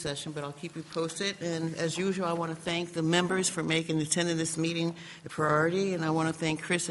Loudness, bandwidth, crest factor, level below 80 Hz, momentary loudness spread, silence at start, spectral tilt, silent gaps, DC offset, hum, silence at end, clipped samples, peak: -30 LUFS; 11.5 kHz; 18 dB; -66 dBFS; 10 LU; 0 s; -4 dB/octave; none; under 0.1%; none; 0 s; under 0.1%; -12 dBFS